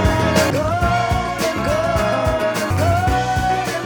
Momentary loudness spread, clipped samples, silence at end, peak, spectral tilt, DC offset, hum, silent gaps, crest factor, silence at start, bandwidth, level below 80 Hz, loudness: 3 LU; under 0.1%; 0 s; -2 dBFS; -5.5 dB/octave; 0.1%; none; none; 16 dB; 0 s; over 20 kHz; -30 dBFS; -18 LUFS